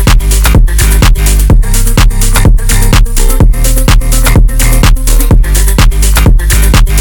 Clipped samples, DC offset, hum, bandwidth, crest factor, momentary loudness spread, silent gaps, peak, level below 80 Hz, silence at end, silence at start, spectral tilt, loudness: 5%; under 0.1%; none; 19.5 kHz; 4 dB; 2 LU; none; 0 dBFS; -6 dBFS; 0 s; 0 s; -4 dB/octave; -8 LUFS